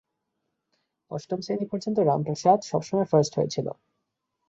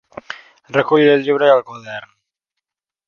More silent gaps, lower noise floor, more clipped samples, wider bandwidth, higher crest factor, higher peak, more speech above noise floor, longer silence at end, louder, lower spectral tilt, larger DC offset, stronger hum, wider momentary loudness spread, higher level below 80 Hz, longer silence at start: neither; about the same, -80 dBFS vs -82 dBFS; neither; first, 8 kHz vs 6.8 kHz; about the same, 20 dB vs 18 dB; second, -6 dBFS vs 0 dBFS; second, 55 dB vs 67 dB; second, 0.75 s vs 1.05 s; second, -25 LUFS vs -14 LUFS; about the same, -6.5 dB/octave vs -6.5 dB/octave; neither; neither; second, 14 LU vs 20 LU; about the same, -66 dBFS vs -64 dBFS; first, 1.1 s vs 0.3 s